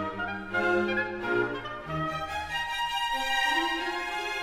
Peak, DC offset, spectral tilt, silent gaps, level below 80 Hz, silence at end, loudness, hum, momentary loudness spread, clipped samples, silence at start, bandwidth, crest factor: -14 dBFS; under 0.1%; -3.5 dB/octave; none; -52 dBFS; 0 s; -29 LUFS; none; 7 LU; under 0.1%; 0 s; 16 kHz; 16 dB